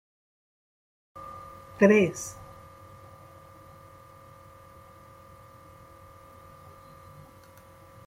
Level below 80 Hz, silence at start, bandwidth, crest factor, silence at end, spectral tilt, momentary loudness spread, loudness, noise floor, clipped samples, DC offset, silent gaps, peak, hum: -64 dBFS; 1.15 s; 16 kHz; 26 dB; 5.75 s; -6 dB/octave; 28 LU; -23 LUFS; -52 dBFS; under 0.1%; under 0.1%; none; -6 dBFS; none